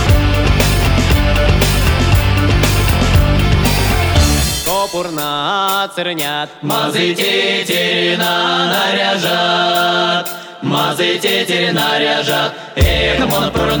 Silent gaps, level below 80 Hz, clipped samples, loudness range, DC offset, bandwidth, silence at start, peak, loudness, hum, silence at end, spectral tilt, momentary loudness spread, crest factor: none; -20 dBFS; under 0.1%; 3 LU; under 0.1%; over 20 kHz; 0 s; -2 dBFS; -14 LUFS; none; 0 s; -4.5 dB/octave; 5 LU; 12 dB